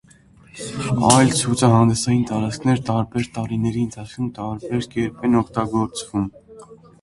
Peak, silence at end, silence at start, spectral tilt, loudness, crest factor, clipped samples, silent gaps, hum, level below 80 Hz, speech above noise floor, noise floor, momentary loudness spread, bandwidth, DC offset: 0 dBFS; 0.3 s; 0.55 s; -5.5 dB/octave; -20 LUFS; 20 dB; under 0.1%; none; none; -48 dBFS; 30 dB; -50 dBFS; 13 LU; 11.5 kHz; under 0.1%